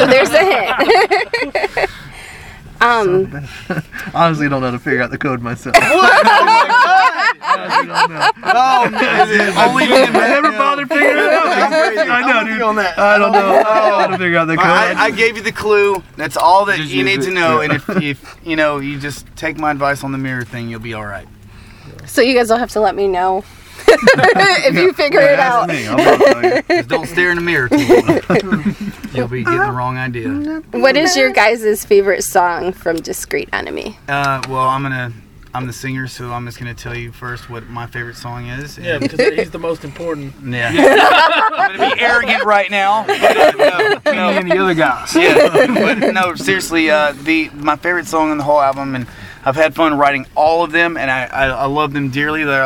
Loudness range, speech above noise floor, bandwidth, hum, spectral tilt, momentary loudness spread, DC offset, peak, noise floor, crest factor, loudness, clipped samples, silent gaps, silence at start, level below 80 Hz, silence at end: 9 LU; 24 dB; 19 kHz; none; -4.5 dB/octave; 15 LU; under 0.1%; 0 dBFS; -38 dBFS; 14 dB; -13 LUFS; under 0.1%; none; 0 s; -44 dBFS; 0 s